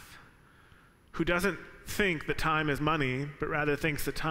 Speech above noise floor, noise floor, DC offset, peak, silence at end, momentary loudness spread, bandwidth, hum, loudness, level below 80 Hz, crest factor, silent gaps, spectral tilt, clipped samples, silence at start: 29 dB; -59 dBFS; under 0.1%; -14 dBFS; 0 s; 6 LU; 16 kHz; none; -30 LUFS; -46 dBFS; 18 dB; none; -5 dB/octave; under 0.1%; 0 s